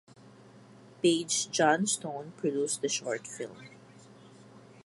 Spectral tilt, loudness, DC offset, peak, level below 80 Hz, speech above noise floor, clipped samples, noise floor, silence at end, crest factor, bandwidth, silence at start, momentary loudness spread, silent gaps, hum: -3 dB/octave; -30 LUFS; under 0.1%; -10 dBFS; -80 dBFS; 24 dB; under 0.1%; -54 dBFS; 0.05 s; 22 dB; 11.5 kHz; 0.25 s; 16 LU; none; none